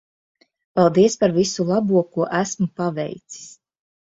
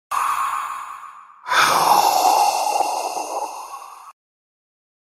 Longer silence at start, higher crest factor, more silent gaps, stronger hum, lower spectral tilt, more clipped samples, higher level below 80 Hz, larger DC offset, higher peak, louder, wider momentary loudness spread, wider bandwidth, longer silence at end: first, 0.75 s vs 0.1 s; about the same, 18 dB vs 18 dB; neither; neither; first, -5.5 dB/octave vs -0.5 dB/octave; neither; first, -60 dBFS vs -66 dBFS; neither; about the same, -4 dBFS vs -4 dBFS; about the same, -20 LUFS vs -19 LUFS; second, 15 LU vs 22 LU; second, 7.8 kHz vs 16 kHz; second, 0.65 s vs 1.05 s